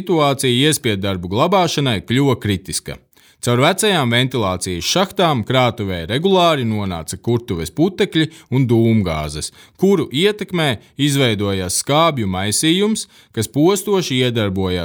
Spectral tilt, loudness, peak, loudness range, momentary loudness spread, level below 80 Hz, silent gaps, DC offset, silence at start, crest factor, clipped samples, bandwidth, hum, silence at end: -4.5 dB/octave; -17 LUFS; -2 dBFS; 1 LU; 9 LU; -44 dBFS; none; under 0.1%; 0 s; 16 dB; under 0.1%; over 20 kHz; none; 0 s